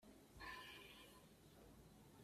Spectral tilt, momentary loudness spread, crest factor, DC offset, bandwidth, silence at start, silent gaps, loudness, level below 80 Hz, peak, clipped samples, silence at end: -3.5 dB/octave; 11 LU; 18 dB; under 0.1%; 15.5 kHz; 0 s; none; -60 LUFS; -74 dBFS; -44 dBFS; under 0.1%; 0 s